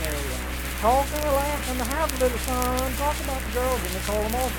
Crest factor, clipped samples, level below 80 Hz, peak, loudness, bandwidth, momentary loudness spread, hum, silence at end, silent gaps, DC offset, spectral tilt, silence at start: 22 dB; under 0.1%; -32 dBFS; -4 dBFS; -25 LUFS; 19 kHz; 6 LU; none; 0 s; none; under 0.1%; -4 dB/octave; 0 s